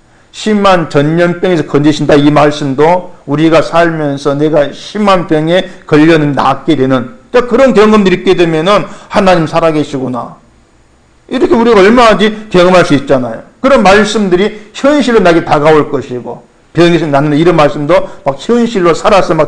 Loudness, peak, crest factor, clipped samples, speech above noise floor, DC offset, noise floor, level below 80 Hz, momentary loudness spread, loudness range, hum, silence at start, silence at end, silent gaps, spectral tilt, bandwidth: -8 LUFS; 0 dBFS; 8 dB; 1%; 37 dB; under 0.1%; -45 dBFS; -34 dBFS; 9 LU; 2 LU; none; 0.35 s; 0 s; none; -6 dB/octave; 10 kHz